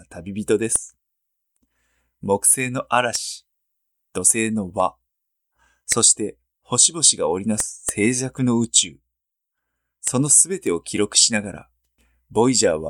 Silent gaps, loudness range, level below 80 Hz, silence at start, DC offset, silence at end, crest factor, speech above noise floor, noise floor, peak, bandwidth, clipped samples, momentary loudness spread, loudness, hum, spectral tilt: none; 4 LU; -56 dBFS; 0.1 s; under 0.1%; 0 s; 22 dB; 61 dB; -81 dBFS; 0 dBFS; 19 kHz; under 0.1%; 14 LU; -18 LUFS; none; -2.5 dB/octave